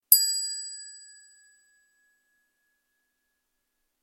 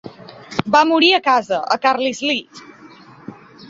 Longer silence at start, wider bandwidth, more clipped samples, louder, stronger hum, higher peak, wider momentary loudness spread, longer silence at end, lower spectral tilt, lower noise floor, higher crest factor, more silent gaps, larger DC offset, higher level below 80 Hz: about the same, 0.1 s vs 0.05 s; first, 16.5 kHz vs 7.8 kHz; neither; second, -23 LUFS vs -16 LUFS; neither; about the same, -2 dBFS vs -2 dBFS; first, 25 LU vs 13 LU; first, 3.05 s vs 0.05 s; second, 7.5 dB/octave vs -3.5 dB/octave; first, -79 dBFS vs -43 dBFS; first, 30 dB vs 18 dB; neither; neither; second, -88 dBFS vs -60 dBFS